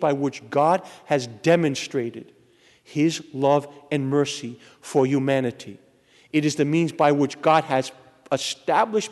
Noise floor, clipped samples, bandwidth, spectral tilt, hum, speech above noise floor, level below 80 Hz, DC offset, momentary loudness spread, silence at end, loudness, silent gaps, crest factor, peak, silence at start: -57 dBFS; under 0.1%; 12 kHz; -5.5 dB/octave; none; 35 dB; -70 dBFS; under 0.1%; 12 LU; 0 s; -23 LUFS; none; 18 dB; -6 dBFS; 0 s